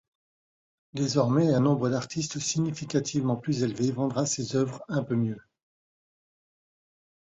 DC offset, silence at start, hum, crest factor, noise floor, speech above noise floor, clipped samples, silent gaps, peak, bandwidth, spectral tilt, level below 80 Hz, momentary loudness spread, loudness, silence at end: under 0.1%; 0.95 s; none; 18 dB; under -90 dBFS; over 63 dB; under 0.1%; none; -10 dBFS; 8.4 kHz; -5.5 dB/octave; -64 dBFS; 9 LU; -27 LUFS; 1.85 s